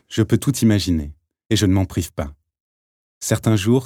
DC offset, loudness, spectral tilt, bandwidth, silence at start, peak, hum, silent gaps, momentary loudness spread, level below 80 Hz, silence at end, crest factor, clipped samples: under 0.1%; -20 LUFS; -5.5 dB/octave; 17.5 kHz; 0.1 s; -2 dBFS; none; 2.60-3.21 s; 12 LU; -40 dBFS; 0 s; 18 dB; under 0.1%